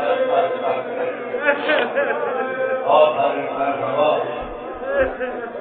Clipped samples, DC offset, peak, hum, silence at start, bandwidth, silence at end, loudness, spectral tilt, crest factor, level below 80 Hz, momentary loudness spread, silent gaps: under 0.1%; under 0.1%; -2 dBFS; none; 0 s; 4.4 kHz; 0 s; -20 LUFS; -9 dB/octave; 18 dB; -50 dBFS; 10 LU; none